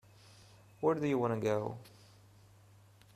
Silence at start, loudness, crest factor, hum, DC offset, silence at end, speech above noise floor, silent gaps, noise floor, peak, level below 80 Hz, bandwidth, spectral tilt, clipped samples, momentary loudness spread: 0.8 s; -34 LUFS; 20 dB; none; under 0.1%; 1.25 s; 28 dB; none; -61 dBFS; -18 dBFS; -72 dBFS; 14 kHz; -7.5 dB/octave; under 0.1%; 10 LU